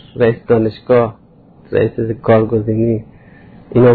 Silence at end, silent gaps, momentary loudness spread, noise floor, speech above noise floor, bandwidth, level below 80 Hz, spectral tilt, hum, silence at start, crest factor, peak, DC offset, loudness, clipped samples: 0 s; none; 7 LU; -40 dBFS; 26 dB; 4.7 kHz; -42 dBFS; -12 dB/octave; none; 0.15 s; 14 dB; 0 dBFS; under 0.1%; -15 LUFS; under 0.1%